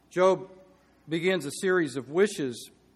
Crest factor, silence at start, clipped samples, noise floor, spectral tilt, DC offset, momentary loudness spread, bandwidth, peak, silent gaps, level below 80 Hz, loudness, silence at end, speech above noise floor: 18 dB; 0.15 s; under 0.1%; -58 dBFS; -5 dB/octave; under 0.1%; 10 LU; 13.5 kHz; -10 dBFS; none; -72 dBFS; -27 LUFS; 0.3 s; 31 dB